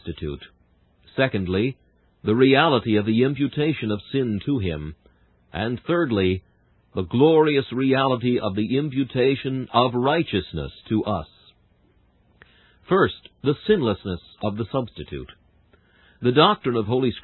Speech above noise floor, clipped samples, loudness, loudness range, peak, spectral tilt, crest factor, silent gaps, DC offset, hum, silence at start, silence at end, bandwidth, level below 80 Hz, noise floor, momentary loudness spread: 39 dB; under 0.1%; -22 LUFS; 5 LU; -2 dBFS; -11 dB/octave; 22 dB; none; under 0.1%; none; 0.05 s; 0.05 s; 4.3 kHz; -46 dBFS; -60 dBFS; 15 LU